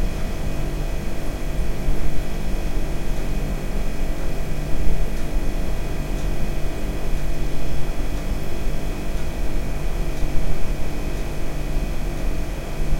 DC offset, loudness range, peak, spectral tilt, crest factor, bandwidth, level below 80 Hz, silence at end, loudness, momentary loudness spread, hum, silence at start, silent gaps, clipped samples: under 0.1%; 1 LU; -4 dBFS; -6 dB/octave; 14 dB; 15.5 kHz; -24 dBFS; 0 s; -29 LUFS; 2 LU; none; 0 s; none; under 0.1%